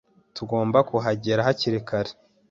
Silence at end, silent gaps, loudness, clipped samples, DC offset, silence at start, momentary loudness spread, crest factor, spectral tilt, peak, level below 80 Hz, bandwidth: 0.4 s; none; -24 LUFS; under 0.1%; under 0.1%; 0.35 s; 13 LU; 20 dB; -6.5 dB/octave; -4 dBFS; -58 dBFS; 7.6 kHz